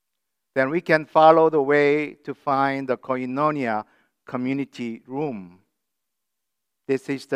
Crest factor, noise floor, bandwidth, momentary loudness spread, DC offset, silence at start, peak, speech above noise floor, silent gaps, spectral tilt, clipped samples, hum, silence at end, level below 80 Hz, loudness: 22 dB; -83 dBFS; 11.5 kHz; 16 LU; under 0.1%; 0.55 s; 0 dBFS; 61 dB; none; -7 dB/octave; under 0.1%; none; 0 s; -78 dBFS; -22 LUFS